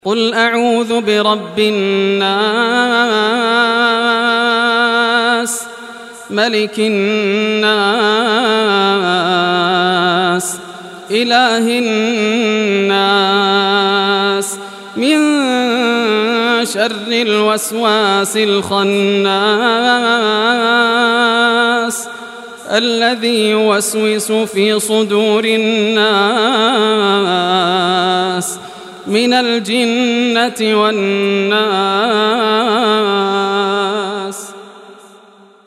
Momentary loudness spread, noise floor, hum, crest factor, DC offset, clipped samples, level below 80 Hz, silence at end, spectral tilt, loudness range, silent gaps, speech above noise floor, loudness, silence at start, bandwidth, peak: 6 LU; -43 dBFS; none; 12 dB; under 0.1%; under 0.1%; -66 dBFS; 0.7 s; -3.5 dB/octave; 2 LU; none; 30 dB; -13 LUFS; 0.05 s; 14 kHz; 0 dBFS